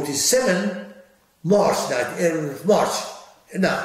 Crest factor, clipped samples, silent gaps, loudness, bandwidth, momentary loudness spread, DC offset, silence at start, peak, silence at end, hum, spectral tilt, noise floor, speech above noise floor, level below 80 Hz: 16 dB; under 0.1%; none; -21 LUFS; 16 kHz; 14 LU; under 0.1%; 0 s; -6 dBFS; 0 s; none; -3.5 dB/octave; -52 dBFS; 31 dB; -64 dBFS